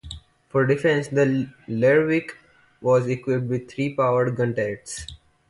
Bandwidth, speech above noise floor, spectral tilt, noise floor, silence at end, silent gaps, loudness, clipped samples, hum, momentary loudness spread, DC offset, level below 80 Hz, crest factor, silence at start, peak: 11.5 kHz; 20 dB; -6.5 dB/octave; -41 dBFS; 0.35 s; none; -22 LUFS; under 0.1%; none; 15 LU; under 0.1%; -52 dBFS; 16 dB; 0.05 s; -6 dBFS